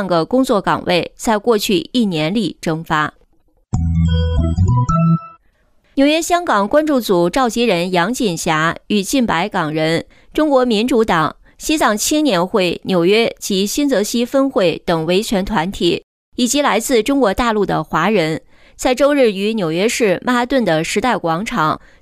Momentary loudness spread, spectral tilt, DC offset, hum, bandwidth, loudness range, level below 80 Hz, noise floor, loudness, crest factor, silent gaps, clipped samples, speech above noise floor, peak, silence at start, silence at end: 5 LU; -5 dB/octave; under 0.1%; none; 16 kHz; 2 LU; -34 dBFS; -56 dBFS; -16 LUFS; 12 dB; 16.04-16.32 s; under 0.1%; 40 dB; -2 dBFS; 0 s; 0.25 s